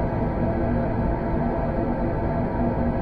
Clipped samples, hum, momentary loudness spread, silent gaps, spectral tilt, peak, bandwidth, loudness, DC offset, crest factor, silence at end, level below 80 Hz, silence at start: under 0.1%; none; 1 LU; none; -11 dB/octave; -12 dBFS; 5.2 kHz; -25 LUFS; under 0.1%; 12 dB; 0 s; -30 dBFS; 0 s